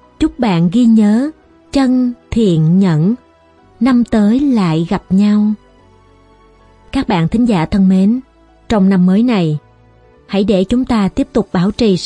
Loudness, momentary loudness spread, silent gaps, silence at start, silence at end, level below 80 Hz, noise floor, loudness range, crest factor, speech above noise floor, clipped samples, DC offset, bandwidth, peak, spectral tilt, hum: -13 LUFS; 8 LU; none; 0.2 s; 0 s; -36 dBFS; -47 dBFS; 3 LU; 12 dB; 36 dB; under 0.1%; under 0.1%; 10.5 kHz; 0 dBFS; -8 dB/octave; none